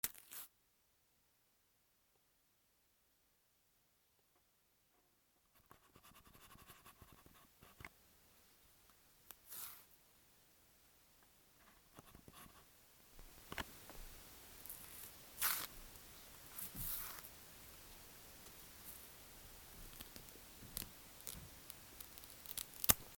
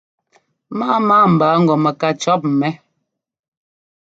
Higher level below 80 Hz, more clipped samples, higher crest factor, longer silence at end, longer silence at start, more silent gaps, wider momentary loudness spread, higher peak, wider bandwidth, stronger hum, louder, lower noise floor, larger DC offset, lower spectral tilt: about the same, -66 dBFS vs -62 dBFS; neither; first, 46 dB vs 16 dB; second, 0 s vs 1.35 s; second, 0.05 s vs 0.7 s; neither; first, 23 LU vs 12 LU; second, -6 dBFS vs -2 dBFS; first, over 20 kHz vs 7.8 kHz; neither; second, -47 LUFS vs -15 LUFS; first, -78 dBFS vs -73 dBFS; neither; second, -1.5 dB/octave vs -6.5 dB/octave